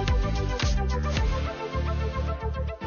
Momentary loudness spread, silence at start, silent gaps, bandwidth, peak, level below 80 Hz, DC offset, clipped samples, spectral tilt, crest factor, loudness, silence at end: 4 LU; 0 s; none; 7 kHz; -14 dBFS; -28 dBFS; under 0.1%; under 0.1%; -6 dB/octave; 12 dB; -28 LUFS; 0 s